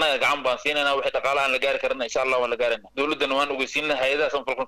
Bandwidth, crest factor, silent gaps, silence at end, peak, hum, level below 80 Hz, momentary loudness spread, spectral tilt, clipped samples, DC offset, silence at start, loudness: 15.5 kHz; 12 dB; none; 0 s; -12 dBFS; none; -56 dBFS; 4 LU; -2 dB/octave; under 0.1%; under 0.1%; 0 s; -23 LUFS